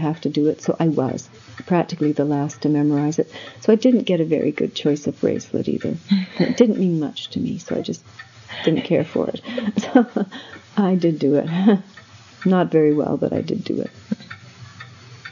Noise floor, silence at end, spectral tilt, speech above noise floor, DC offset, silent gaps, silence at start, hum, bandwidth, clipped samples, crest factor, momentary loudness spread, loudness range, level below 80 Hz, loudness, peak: -42 dBFS; 0 s; -7 dB/octave; 22 dB; under 0.1%; none; 0 s; none; 7.4 kHz; under 0.1%; 20 dB; 14 LU; 3 LU; -68 dBFS; -20 LUFS; 0 dBFS